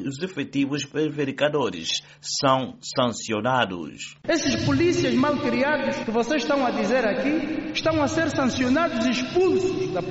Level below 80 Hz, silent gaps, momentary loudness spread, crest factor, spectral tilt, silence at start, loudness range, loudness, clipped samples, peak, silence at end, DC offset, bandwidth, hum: -52 dBFS; none; 6 LU; 16 dB; -3.5 dB/octave; 0 s; 2 LU; -23 LUFS; under 0.1%; -6 dBFS; 0 s; under 0.1%; 8 kHz; none